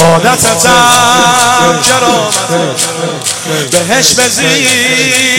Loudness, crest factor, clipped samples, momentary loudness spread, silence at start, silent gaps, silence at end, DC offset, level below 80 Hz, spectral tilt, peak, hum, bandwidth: -7 LUFS; 8 dB; 0.5%; 7 LU; 0 s; none; 0 s; under 0.1%; -40 dBFS; -2 dB/octave; 0 dBFS; none; over 20 kHz